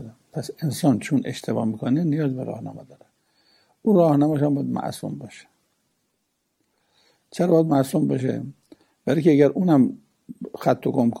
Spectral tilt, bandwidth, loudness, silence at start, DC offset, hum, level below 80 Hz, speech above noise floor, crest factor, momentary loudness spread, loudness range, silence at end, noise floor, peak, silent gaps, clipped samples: -7.5 dB/octave; 16 kHz; -22 LUFS; 0 s; under 0.1%; none; -68 dBFS; 53 dB; 18 dB; 18 LU; 5 LU; 0 s; -74 dBFS; -4 dBFS; none; under 0.1%